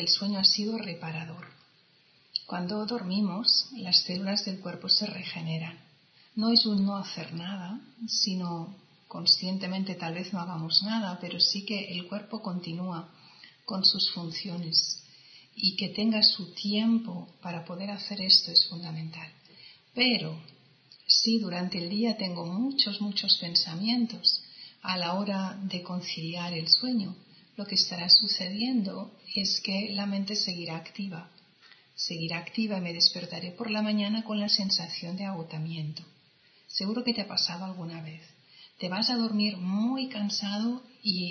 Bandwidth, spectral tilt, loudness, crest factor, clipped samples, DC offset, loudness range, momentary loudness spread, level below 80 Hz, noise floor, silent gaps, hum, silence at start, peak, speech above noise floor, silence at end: 6.6 kHz; -4 dB/octave; -27 LUFS; 24 dB; under 0.1%; under 0.1%; 6 LU; 16 LU; -78 dBFS; -63 dBFS; none; none; 0 s; -6 dBFS; 34 dB; 0 s